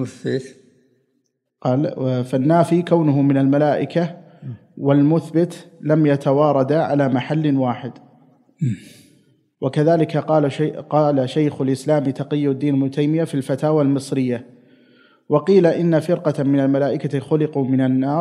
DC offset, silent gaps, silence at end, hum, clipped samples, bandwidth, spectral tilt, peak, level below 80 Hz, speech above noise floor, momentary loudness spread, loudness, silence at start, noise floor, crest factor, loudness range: under 0.1%; none; 0 s; none; under 0.1%; 12 kHz; -8.5 dB/octave; -2 dBFS; -72 dBFS; 52 dB; 9 LU; -19 LUFS; 0 s; -70 dBFS; 18 dB; 3 LU